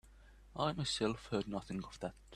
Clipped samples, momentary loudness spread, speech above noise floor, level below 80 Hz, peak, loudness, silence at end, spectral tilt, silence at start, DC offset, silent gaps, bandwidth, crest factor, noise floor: under 0.1%; 10 LU; 21 dB; -60 dBFS; -20 dBFS; -39 LUFS; 0 s; -5 dB/octave; 0.05 s; under 0.1%; none; 13 kHz; 20 dB; -60 dBFS